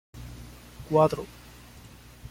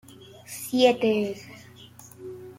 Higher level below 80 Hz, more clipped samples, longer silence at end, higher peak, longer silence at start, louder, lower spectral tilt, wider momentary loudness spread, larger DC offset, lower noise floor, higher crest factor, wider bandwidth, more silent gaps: first, -50 dBFS vs -70 dBFS; neither; about the same, 0 s vs 0.05 s; about the same, -8 dBFS vs -6 dBFS; about the same, 0.15 s vs 0.2 s; about the same, -25 LUFS vs -24 LUFS; first, -7 dB/octave vs -4 dB/octave; about the same, 26 LU vs 26 LU; neither; about the same, -49 dBFS vs -48 dBFS; about the same, 22 dB vs 22 dB; about the same, 16.5 kHz vs 16.5 kHz; neither